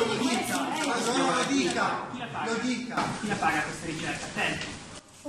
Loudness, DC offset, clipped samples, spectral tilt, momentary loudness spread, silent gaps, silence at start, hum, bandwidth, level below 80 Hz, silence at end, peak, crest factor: -28 LUFS; under 0.1%; under 0.1%; -3.5 dB/octave; 8 LU; none; 0 s; none; 13.5 kHz; -60 dBFS; 0 s; -14 dBFS; 16 dB